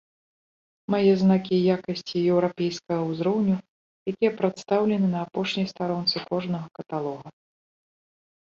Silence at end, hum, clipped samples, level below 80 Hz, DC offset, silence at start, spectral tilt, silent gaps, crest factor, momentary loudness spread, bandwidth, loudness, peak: 1.15 s; none; under 0.1%; -66 dBFS; under 0.1%; 0.9 s; -7 dB/octave; 3.68-4.06 s; 18 dB; 11 LU; 7.2 kHz; -25 LUFS; -8 dBFS